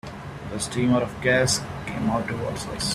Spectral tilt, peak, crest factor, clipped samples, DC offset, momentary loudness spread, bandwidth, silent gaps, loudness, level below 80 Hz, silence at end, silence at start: -4 dB/octave; -8 dBFS; 18 dB; under 0.1%; under 0.1%; 12 LU; 14 kHz; none; -24 LUFS; -46 dBFS; 0 s; 0.05 s